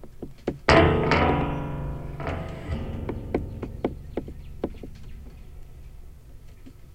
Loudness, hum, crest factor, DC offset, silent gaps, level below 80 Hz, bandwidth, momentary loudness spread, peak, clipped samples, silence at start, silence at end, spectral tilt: -26 LUFS; none; 26 dB; under 0.1%; none; -38 dBFS; 14.5 kHz; 26 LU; 0 dBFS; under 0.1%; 0 s; 0 s; -6.5 dB/octave